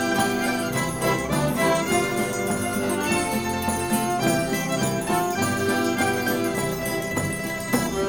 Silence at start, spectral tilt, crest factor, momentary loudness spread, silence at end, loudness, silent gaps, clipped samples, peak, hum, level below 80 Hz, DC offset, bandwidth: 0 s; -4 dB/octave; 16 dB; 4 LU; 0 s; -23 LUFS; none; under 0.1%; -8 dBFS; none; -46 dBFS; 0.2%; 19 kHz